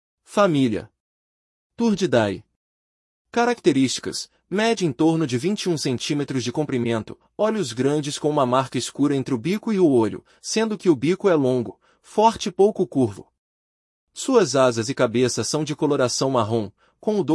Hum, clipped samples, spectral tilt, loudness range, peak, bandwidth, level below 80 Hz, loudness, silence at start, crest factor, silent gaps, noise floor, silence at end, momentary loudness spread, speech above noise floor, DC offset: none; under 0.1%; -5 dB/octave; 3 LU; -4 dBFS; 12 kHz; -62 dBFS; -22 LUFS; 0.3 s; 18 dB; 1.00-1.70 s, 2.56-3.25 s, 13.38-14.07 s; under -90 dBFS; 0 s; 8 LU; over 69 dB; under 0.1%